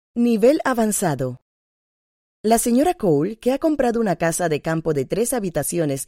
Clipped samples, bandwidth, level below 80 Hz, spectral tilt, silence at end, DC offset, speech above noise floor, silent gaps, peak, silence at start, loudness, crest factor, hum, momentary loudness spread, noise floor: under 0.1%; 16.5 kHz; -48 dBFS; -5 dB/octave; 0.05 s; under 0.1%; over 71 dB; 1.42-2.44 s; -4 dBFS; 0.15 s; -20 LUFS; 16 dB; none; 6 LU; under -90 dBFS